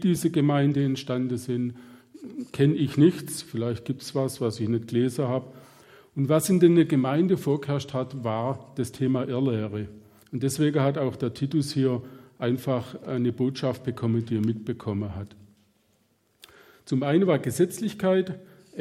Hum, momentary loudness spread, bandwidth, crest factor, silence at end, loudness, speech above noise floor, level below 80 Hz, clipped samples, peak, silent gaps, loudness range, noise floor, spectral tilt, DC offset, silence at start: none; 12 LU; 16 kHz; 18 dB; 0 s; -26 LUFS; 43 dB; -64 dBFS; under 0.1%; -8 dBFS; none; 5 LU; -67 dBFS; -7 dB/octave; under 0.1%; 0 s